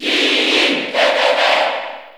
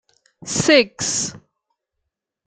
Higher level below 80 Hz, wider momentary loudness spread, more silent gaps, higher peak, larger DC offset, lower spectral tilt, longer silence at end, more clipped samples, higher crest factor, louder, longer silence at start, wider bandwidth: second, -66 dBFS vs -58 dBFS; second, 5 LU vs 13 LU; neither; about the same, -2 dBFS vs -2 dBFS; neither; second, -1 dB/octave vs -2.5 dB/octave; second, 0.05 s vs 1.1 s; neither; second, 14 dB vs 22 dB; first, -14 LUFS vs -18 LUFS; second, 0 s vs 0.45 s; first, over 20 kHz vs 10 kHz